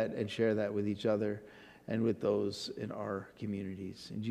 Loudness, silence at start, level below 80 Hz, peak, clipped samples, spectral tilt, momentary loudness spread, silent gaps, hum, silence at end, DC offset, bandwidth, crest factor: -36 LUFS; 0 s; -72 dBFS; -20 dBFS; under 0.1%; -6.5 dB/octave; 11 LU; none; none; 0 s; under 0.1%; 13.5 kHz; 16 dB